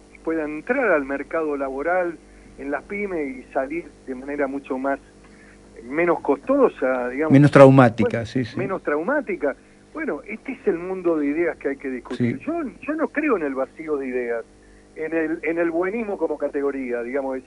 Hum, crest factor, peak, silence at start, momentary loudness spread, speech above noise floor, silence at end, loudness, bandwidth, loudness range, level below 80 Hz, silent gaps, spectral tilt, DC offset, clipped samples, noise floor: 50 Hz at -55 dBFS; 22 dB; 0 dBFS; 0.25 s; 12 LU; 26 dB; 0.05 s; -22 LUFS; 11 kHz; 10 LU; -54 dBFS; none; -8 dB/octave; under 0.1%; under 0.1%; -47 dBFS